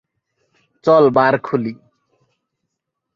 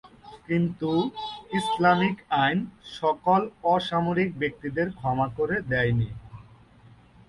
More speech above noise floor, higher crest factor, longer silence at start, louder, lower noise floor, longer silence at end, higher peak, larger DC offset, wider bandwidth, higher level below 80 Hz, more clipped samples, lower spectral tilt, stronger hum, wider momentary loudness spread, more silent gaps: first, 64 dB vs 28 dB; about the same, 18 dB vs 18 dB; first, 0.85 s vs 0.05 s; first, -15 LUFS vs -26 LUFS; first, -78 dBFS vs -53 dBFS; first, 1.4 s vs 0.85 s; first, 0 dBFS vs -8 dBFS; neither; second, 7.2 kHz vs 11.5 kHz; second, -60 dBFS vs -54 dBFS; neither; about the same, -8 dB/octave vs -7 dB/octave; neither; first, 11 LU vs 8 LU; neither